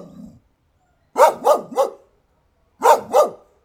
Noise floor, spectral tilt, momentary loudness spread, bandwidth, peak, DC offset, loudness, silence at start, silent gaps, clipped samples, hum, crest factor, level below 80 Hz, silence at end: -63 dBFS; -3 dB/octave; 8 LU; 18.5 kHz; 0 dBFS; under 0.1%; -17 LUFS; 1.15 s; none; under 0.1%; none; 20 dB; -64 dBFS; 0.3 s